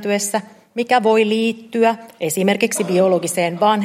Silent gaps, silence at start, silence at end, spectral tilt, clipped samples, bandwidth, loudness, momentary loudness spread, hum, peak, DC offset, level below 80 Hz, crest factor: none; 0 s; 0 s; -4 dB/octave; under 0.1%; 16.5 kHz; -18 LUFS; 9 LU; none; -2 dBFS; under 0.1%; -70 dBFS; 16 dB